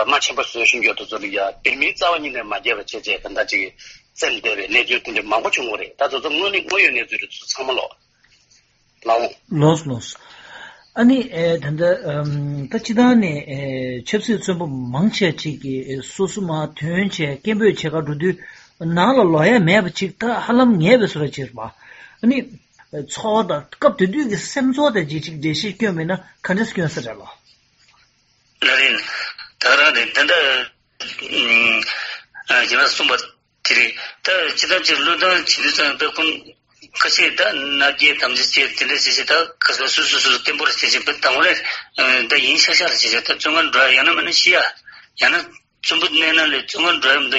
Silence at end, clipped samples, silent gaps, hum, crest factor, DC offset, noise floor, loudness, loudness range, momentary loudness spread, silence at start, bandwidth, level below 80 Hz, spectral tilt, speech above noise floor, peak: 0 s; under 0.1%; none; none; 18 dB; under 0.1%; -60 dBFS; -16 LUFS; 7 LU; 12 LU; 0 s; 8 kHz; -56 dBFS; -2 dB/octave; 42 dB; 0 dBFS